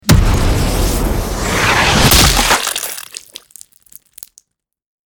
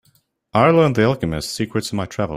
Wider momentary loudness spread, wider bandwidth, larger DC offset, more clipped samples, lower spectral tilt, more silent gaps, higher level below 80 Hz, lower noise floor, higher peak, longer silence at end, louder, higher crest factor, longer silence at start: first, 22 LU vs 10 LU; first, over 20 kHz vs 16 kHz; neither; neither; second, -3.5 dB/octave vs -6 dB/octave; neither; first, -20 dBFS vs -46 dBFS; second, -56 dBFS vs -61 dBFS; about the same, 0 dBFS vs -2 dBFS; first, 2 s vs 0 s; first, -12 LUFS vs -18 LUFS; about the same, 14 dB vs 18 dB; second, 0.05 s vs 0.55 s